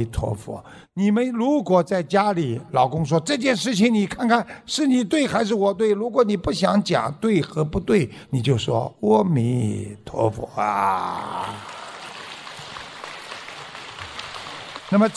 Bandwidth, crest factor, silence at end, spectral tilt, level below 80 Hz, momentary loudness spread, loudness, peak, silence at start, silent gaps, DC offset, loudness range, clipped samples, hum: 11 kHz; 18 dB; 0 s; -6 dB/octave; -46 dBFS; 16 LU; -21 LUFS; -4 dBFS; 0 s; none; under 0.1%; 9 LU; under 0.1%; none